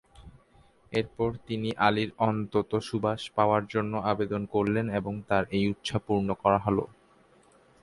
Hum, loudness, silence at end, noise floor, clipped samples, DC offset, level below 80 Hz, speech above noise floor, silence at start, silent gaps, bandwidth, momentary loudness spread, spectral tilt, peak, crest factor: none; -28 LUFS; 0.95 s; -60 dBFS; under 0.1%; under 0.1%; -54 dBFS; 33 dB; 0.15 s; none; 11.5 kHz; 7 LU; -7 dB/octave; -8 dBFS; 22 dB